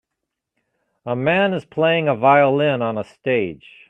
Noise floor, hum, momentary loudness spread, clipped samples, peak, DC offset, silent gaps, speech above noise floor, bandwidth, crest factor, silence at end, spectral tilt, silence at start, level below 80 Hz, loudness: -80 dBFS; none; 12 LU; under 0.1%; -2 dBFS; under 0.1%; none; 62 dB; 8 kHz; 18 dB; 0.35 s; -8 dB/octave; 1.05 s; -62 dBFS; -18 LUFS